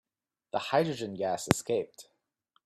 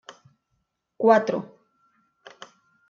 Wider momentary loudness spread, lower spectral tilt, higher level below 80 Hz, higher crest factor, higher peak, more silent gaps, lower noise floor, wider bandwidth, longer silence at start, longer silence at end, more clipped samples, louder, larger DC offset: second, 8 LU vs 27 LU; second, -4.5 dB/octave vs -6 dB/octave; first, -64 dBFS vs -78 dBFS; first, 32 dB vs 22 dB; first, 0 dBFS vs -6 dBFS; neither; first, -88 dBFS vs -76 dBFS; first, 15 kHz vs 7.4 kHz; second, 0.55 s vs 1 s; second, 0.65 s vs 1.45 s; neither; second, -31 LUFS vs -22 LUFS; neither